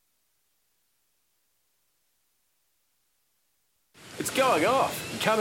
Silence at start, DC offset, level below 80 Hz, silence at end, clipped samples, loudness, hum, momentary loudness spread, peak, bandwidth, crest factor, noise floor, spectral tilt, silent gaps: 4 s; under 0.1%; -68 dBFS; 0 s; under 0.1%; -25 LUFS; none; 11 LU; -8 dBFS; 16.5 kHz; 22 dB; -74 dBFS; -3 dB/octave; none